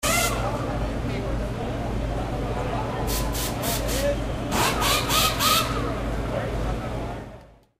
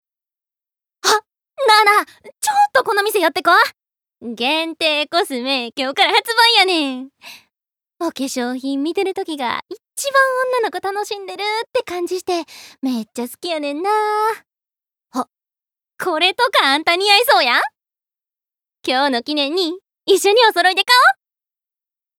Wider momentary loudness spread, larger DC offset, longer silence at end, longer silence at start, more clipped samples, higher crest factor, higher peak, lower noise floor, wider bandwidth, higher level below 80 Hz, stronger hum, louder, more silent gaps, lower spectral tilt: second, 9 LU vs 15 LU; neither; second, 0.3 s vs 1.05 s; second, 0 s vs 1.05 s; neither; about the same, 18 dB vs 16 dB; second, -8 dBFS vs -2 dBFS; second, -46 dBFS vs -88 dBFS; second, 16 kHz vs 19.5 kHz; first, -32 dBFS vs -70 dBFS; neither; second, -25 LUFS vs -16 LUFS; neither; first, -3.5 dB/octave vs -0.5 dB/octave